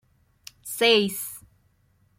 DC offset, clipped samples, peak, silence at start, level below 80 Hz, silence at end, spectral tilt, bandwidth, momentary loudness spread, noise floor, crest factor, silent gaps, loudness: under 0.1%; under 0.1%; -6 dBFS; 0.65 s; -66 dBFS; 0.8 s; -2.5 dB/octave; 16.5 kHz; 22 LU; -65 dBFS; 22 dB; none; -22 LUFS